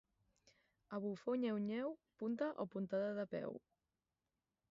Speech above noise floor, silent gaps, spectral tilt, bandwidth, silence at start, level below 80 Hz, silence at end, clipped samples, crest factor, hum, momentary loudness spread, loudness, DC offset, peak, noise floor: over 47 dB; none; -6.5 dB/octave; 7.4 kHz; 0.9 s; -84 dBFS; 1.1 s; under 0.1%; 16 dB; none; 8 LU; -43 LUFS; under 0.1%; -28 dBFS; under -90 dBFS